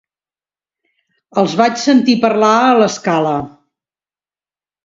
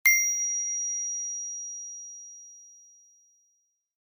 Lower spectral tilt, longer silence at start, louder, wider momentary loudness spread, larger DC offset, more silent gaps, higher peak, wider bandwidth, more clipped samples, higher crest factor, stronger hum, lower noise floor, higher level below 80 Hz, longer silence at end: first, -5 dB/octave vs 8 dB/octave; first, 1.35 s vs 0.05 s; first, -13 LUFS vs -27 LUFS; second, 10 LU vs 22 LU; neither; neither; first, 0 dBFS vs -8 dBFS; second, 7.8 kHz vs over 20 kHz; neither; second, 16 dB vs 22 dB; neither; first, under -90 dBFS vs -73 dBFS; first, -58 dBFS vs under -90 dBFS; about the same, 1.35 s vs 1.35 s